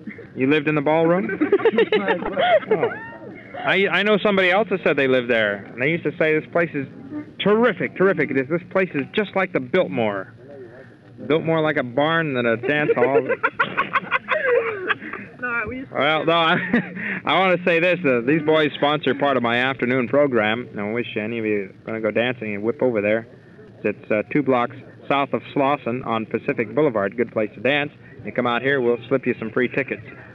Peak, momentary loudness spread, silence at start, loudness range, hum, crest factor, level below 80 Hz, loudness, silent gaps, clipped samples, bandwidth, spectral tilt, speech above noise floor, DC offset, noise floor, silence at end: -6 dBFS; 9 LU; 0 s; 4 LU; none; 16 dB; -60 dBFS; -21 LUFS; none; under 0.1%; 6.8 kHz; -7.5 dB/octave; 23 dB; under 0.1%; -44 dBFS; 0 s